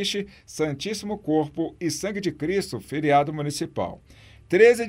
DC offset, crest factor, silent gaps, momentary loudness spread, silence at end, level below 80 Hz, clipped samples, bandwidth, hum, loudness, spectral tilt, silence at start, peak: under 0.1%; 20 dB; none; 10 LU; 0 s; -56 dBFS; under 0.1%; 16 kHz; none; -25 LUFS; -5 dB/octave; 0 s; -4 dBFS